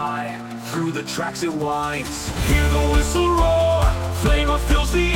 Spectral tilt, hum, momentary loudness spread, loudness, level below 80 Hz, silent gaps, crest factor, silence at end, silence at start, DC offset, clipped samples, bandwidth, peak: -5 dB/octave; none; 9 LU; -21 LUFS; -24 dBFS; none; 14 dB; 0 s; 0 s; under 0.1%; under 0.1%; 17 kHz; -6 dBFS